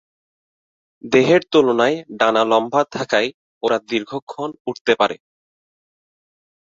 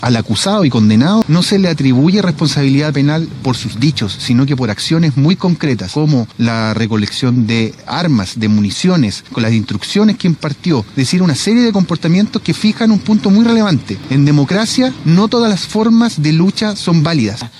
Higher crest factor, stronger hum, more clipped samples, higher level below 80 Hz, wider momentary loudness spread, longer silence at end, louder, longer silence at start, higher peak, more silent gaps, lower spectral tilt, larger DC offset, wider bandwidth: first, 18 dB vs 12 dB; neither; neither; second, -64 dBFS vs -46 dBFS; first, 13 LU vs 5 LU; first, 1.6 s vs 0.1 s; second, -18 LUFS vs -13 LUFS; first, 1.05 s vs 0 s; about the same, -2 dBFS vs 0 dBFS; first, 3.34-3.61 s, 4.22-4.27 s, 4.60-4.65 s, 4.81-4.85 s vs none; about the same, -5 dB/octave vs -6 dB/octave; neither; second, 7.8 kHz vs 12.5 kHz